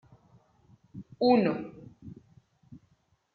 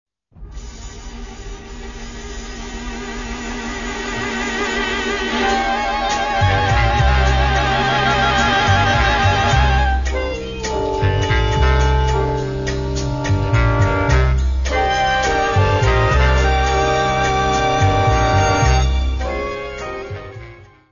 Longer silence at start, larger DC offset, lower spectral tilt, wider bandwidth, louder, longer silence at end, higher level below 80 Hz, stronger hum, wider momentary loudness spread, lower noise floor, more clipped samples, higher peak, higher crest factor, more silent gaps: first, 0.95 s vs 0.35 s; second, under 0.1% vs 0.5%; first, -9 dB/octave vs -5 dB/octave; second, 5 kHz vs 7.4 kHz; second, -26 LUFS vs -17 LUFS; first, 0.6 s vs 0.25 s; second, -68 dBFS vs -22 dBFS; neither; first, 26 LU vs 17 LU; first, -70 dBFS vs -39 dBFS; neither; second, -12 dBFS vs 0 dBFS; first, 22 dB vs 16 dB; neither